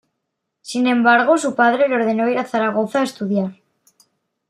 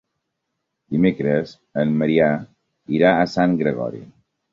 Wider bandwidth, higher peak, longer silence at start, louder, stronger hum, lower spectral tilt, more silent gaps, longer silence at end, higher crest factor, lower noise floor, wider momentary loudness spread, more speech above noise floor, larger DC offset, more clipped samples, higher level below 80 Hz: first, 13 kHz vs 7.4 kHz; about the same, -2 dBFS vs -2 dBFS; second, 0.65 s vs 0.9 s; first, -17 LUFS vs -20 LUFS; neither; second, -5 dB/octave vs -8 dB/octave; neither; first, 0.95 s vs 0.45 s; about the same, 16 dB vs 18 dB; about the same, -77 dBFS vs -77 dBFS; second, 8 LU vs 11 LU; about the same, 60 dB vs 59 dB; neither; neither; second, -72 dBFS vs -56 dBFS